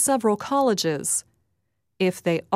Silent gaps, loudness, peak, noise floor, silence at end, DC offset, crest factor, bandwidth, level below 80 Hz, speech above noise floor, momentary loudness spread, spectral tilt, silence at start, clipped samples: none; -23 LUFS; -8 dBFS; -76 dBFS; 0 s; under 0.1%; 16 dB; 16 kHz; -68 dBFS; 53 dB; 5 LU; -3.5 dB/octave; 0 s; under 0.1%